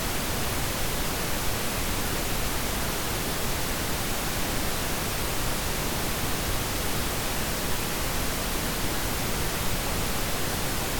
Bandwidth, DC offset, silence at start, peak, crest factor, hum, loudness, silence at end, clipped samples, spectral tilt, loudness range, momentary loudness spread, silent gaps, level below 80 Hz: 19 kHz; under 0.1%; 0 s; -14 dBFS; 14 dB; none; -28 LUFS; 0 s; under 0.1%; -3 dB/octave; 0 LU; 0 LU; none; -36 dBFS